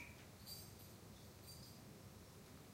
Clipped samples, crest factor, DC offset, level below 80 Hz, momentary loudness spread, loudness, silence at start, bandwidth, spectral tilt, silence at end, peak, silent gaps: under 0.1%; 18 dB; under 0.1%; -70 dBFS; 6 LU; -58 LUFS; 0 s; 16 kHz; -3.5 dB/octave; 0 s; -40 dBFS; none